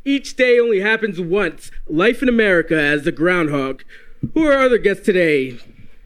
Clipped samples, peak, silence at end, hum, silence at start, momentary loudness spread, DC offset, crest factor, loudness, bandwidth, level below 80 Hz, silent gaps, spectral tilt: under 0.1%; -2 dBFS; 0.1 s; none; 0.05 s; 10 LU; under 0.1%; 16 dB; -16 LUFS; 14 kHz; -38 dBFS; none; -5.5 dB/octave